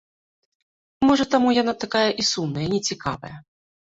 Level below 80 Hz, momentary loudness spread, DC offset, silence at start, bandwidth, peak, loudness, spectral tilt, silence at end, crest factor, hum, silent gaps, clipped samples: -54 dBFS; 11 LU; under 0.1%; 1 s; 8 kHz; -4 dBFS; -21 LUFS; -4 dB/octave; 0.55 s; 18 dB; none; none; under 0.1%